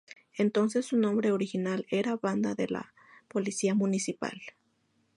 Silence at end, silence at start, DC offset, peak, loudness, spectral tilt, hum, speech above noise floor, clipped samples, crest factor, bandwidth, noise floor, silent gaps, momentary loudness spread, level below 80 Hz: 0.65 s; 0.35 s; under 0.1%; -16 dBFS; -30 LUFS; -5.5 dB/octave; none; 43 dB; under 0.1%; 14 dB; 11.5 kHz; -72 dBFS; none; 11 LU; -76 dBFS